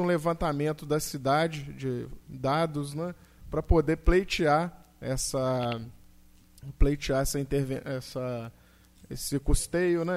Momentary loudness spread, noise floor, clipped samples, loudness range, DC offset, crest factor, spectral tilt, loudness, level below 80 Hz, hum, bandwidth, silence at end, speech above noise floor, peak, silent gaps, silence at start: 13 LU; -56 dBFS; under 0.1%; 4 LU; under 0.1%; 20 dB; -5.5 dB/octave; -29 LUFS; -34 dBFS; none; 16 kHz; 0 s; 29 dB; -8 dBFS; none; 0 s